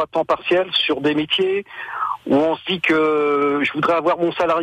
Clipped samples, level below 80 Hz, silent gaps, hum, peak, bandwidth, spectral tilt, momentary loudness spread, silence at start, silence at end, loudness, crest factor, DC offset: under 0.1%; -58 dBFS; none; none; -6 dBFS; 10 kHz; -5.5 dB/octave; 7 LU; 0 s; 0 s; -19 LUFS; 12 dB; under 0.1%